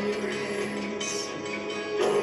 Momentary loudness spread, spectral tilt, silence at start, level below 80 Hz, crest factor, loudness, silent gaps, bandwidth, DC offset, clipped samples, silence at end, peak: 5 LU; -3.5 dB/octave; 0 s; -64 dBFS; 16 dB; -30 LUFS; none; 12.5 kHz; under 0.1%; under 0.1%; 0 s; -14 dBFS